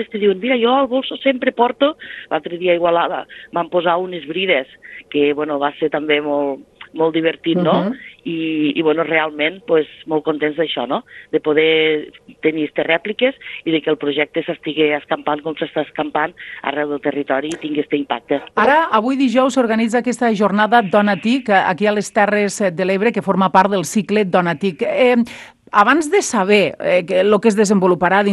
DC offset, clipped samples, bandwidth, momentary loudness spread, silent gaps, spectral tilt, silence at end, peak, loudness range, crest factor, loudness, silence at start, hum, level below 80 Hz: under 0.1%; under 0.1%; 12.5 kHz; 9 LU; none; -5 dB/octave; 0 s; 0 dBFS; 4 LU; 16 dB; -17 LUFS; 0 s; none; -60 dBFS